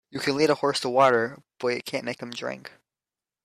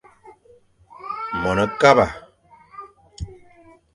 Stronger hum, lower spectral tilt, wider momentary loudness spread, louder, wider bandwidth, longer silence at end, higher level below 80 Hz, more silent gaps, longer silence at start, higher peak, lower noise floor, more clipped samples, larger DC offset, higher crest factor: neither; second, -4 dB/octave vs -5.5 dB/octave; second, 13 LU vs 26 LU; second, -25 LUFS vs -19 LUFS; first, 14 kHz vs 11.5 kHz; first, 0.75 s vs 0.6 s; second, -70 dBFS vs -46 dBFS; neither; about the same, 0.15 s vs 0.25 s; second, -8 dBFS vs 0 dBFS; first, under -90 dBFS vs -54 dBFS; neither; neither; about the same, 18 dB vs 22 dB